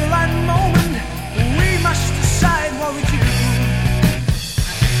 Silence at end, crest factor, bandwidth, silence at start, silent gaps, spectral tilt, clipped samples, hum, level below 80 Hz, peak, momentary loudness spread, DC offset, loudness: 0 s; 14 dB; 16.5 kHz; 0 s; none; -5 dB/octave; under 0.1%; none; -24 dBFS; -2 dBFS; 6 LU; 0.7%; -17 LUFS